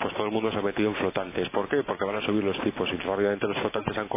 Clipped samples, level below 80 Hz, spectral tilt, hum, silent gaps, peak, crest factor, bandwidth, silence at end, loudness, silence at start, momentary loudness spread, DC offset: under 0.1%; -54 dBFS; -9.5 dB/octave; none; none; -10 dBFS; 18 dB; 3.8 kHz; 0 s; -28 LUFS; 0 s; 3 LU; under 0.1%